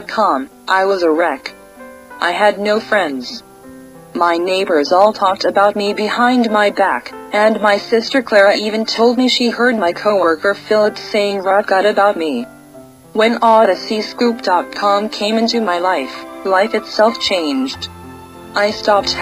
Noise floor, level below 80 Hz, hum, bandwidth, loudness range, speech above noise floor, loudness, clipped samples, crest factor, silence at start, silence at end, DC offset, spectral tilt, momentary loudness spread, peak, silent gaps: -39 dBFS; -54 dBFS; none; 15.5 kHz; 3 LU; 25 dB; -14 LUFS; under 0.1%; 14 dB; 0 s; 0 s; under 0.1%; -4 dB/octave; 11 LU; 0 dBFS; none